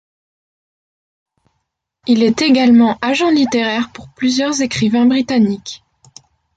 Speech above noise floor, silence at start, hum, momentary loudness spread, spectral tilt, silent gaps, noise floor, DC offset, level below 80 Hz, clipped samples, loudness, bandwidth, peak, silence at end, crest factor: 59 dB; 2.05 s; none; 15 LU; -4.5 dB/octave; none; -72 dBFS; under 0.1%; -54 dBFS; under 0.1%; -14 LUFS; 9 kHz; -2 dBFS; 0.8 s; 14 dB